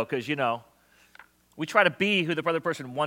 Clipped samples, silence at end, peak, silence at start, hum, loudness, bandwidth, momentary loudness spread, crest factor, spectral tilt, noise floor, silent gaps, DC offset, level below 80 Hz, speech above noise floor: under 0.1%; 0 s; -4 dBFS; 0 s; none; -26 LUFS; 17 kHz; 9 LU; 24 dB; -5 dB/octave; -56 dBFS; none; under 0.1%; -74 dBFS; 29 dB